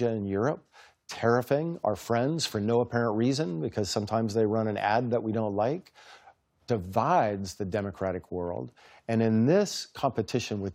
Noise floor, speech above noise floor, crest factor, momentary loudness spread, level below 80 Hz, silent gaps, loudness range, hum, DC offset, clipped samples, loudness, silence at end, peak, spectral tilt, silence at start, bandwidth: -59 dBFS; 31 dB; 18 dB; 9 LU; -66 dBFS; none; 3 LU; none; under 0.1%; under 0.1%; -28 LUFS; 0 s; -10 dBFS; -6 dB/octave; 0 s; 16 kHz